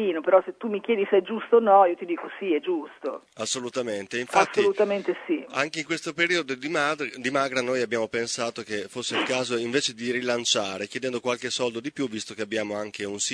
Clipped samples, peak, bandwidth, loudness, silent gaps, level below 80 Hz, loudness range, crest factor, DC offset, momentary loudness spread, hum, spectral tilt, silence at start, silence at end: under 0.1%; -4 dBFS; 11 kHz; -26 LUFS; none; -72 dBFS; 3 LU; 22 dB; under 0.1%; 9 LU; none; -3 dB/octave; 0 s; 0 s